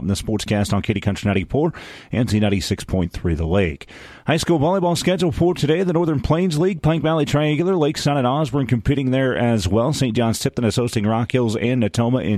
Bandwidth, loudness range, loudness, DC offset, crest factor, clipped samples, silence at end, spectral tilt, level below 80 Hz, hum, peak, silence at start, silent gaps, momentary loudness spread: 14.5 kHz; 3 LU; -20 LUFS; under 0.1%; 16 dB; under 0.1%; 0 s; -6 dB/octave; -38 dBFS; none; -4 dBFS; 0 s; none; 4 LU